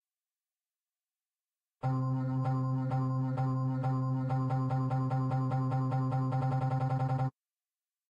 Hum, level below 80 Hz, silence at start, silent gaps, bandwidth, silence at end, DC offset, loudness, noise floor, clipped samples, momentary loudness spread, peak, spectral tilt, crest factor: none; -64 dBFS; 1.85 s; none; 5.4 kHz; 0.8 s; under 0.1%; -32 LUFS; under -90 dBFS; under 0.1%; 1 LU; -22 dBFS; -10 dB/octave; 10 dB